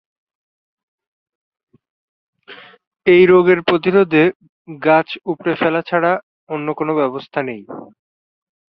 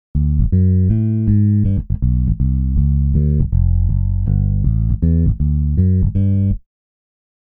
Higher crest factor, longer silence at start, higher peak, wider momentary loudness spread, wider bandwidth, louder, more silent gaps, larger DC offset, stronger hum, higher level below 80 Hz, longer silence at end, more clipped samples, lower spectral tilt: about the same, 16 dB vs 12 dB; first, 2.5 s vs 0.15 s; about the same, -2 dBFS vs -2 dBFS; first, 14 LU vs 4 LU; first, 5.4 kHz vs 1.9 kHz; about the same, -16 LUFS vs -16 LUFS; first, 2.87-2.92 s, 4.35-4.40 s, 4.49-4.65 s, 6.23-6.47 s vs none; neither; neither; second, -60 dBFS vs -20 dBFS; about the same, 0.9 s vs 1 s; neither; second, -9 dB/octave vs -14.5 dB/octave